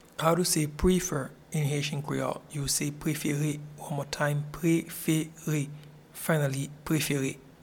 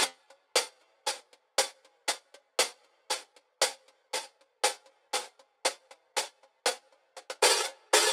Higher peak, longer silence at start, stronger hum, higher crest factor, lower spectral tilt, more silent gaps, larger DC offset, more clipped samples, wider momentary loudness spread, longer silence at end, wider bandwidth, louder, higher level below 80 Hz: about the same, -10 dBFS vs -8 dBFS; first, 0.2 s vs 0 s; neither; second, 20 dB vs 26 dB; first, -5 dB/octave vs 3 dB/octave; neither; neither; neither; second, 9 LU vs 18 LU; first, 0.15 s vs 0 s; about the same, 18.5 kHz vs 18.5 kHz; about the same, -30 LUFS vs -31 LUFS; first, -48 dBFS vs under -90 dBFS